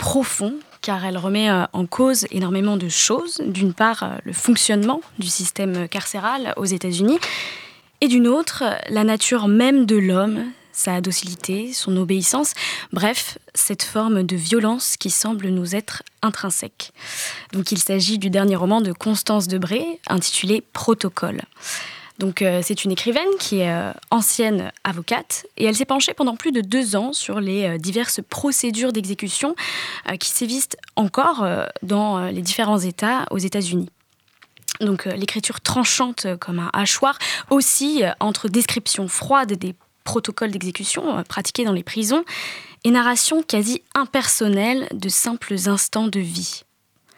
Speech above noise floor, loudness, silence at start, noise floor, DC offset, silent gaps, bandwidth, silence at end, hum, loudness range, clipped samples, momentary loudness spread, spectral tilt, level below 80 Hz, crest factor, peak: 39 dB; -20 LUFS; 0 s; -60 dBFS; under 0.1%; none; 18.5 kHz; 0.55 s; none; 4 LU; under 0.1%; 9 LU; -3.5 dB/octave; -60 dBFS; 18 dB; -2 dBFS